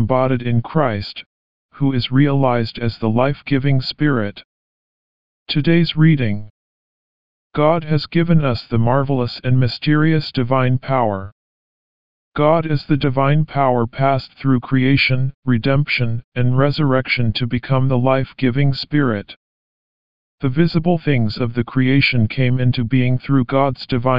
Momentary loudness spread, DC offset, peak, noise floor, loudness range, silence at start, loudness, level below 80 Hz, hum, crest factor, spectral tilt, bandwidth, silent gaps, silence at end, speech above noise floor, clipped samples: 6 LU; 3%; -2 dBFS; under -90 dBFS; 3 LU; 0 s; -17 LUFS; -44 dBFS; none; 16 dB; -6 dB/octave; 5.4 kHz; 1.26-1.69 s, 4.44-5.46 s, 6.50-7.50 s, 11.32-12.32 s, 15.34-15.42 s, 16.24-16.32 s, 19.36-20.38 s; 0 s; over 74 dB; under 0.1%